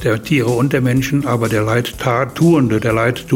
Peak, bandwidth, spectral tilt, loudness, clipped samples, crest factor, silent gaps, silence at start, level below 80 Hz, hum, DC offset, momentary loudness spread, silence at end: -2 dBFS; 16.5 kHz; -6.5 dB/octave; -15 LUFS; under 0.1%; 12 dB; none; 0 s; -40 dBFS; none; under 0.1%; 4 LU; 0 s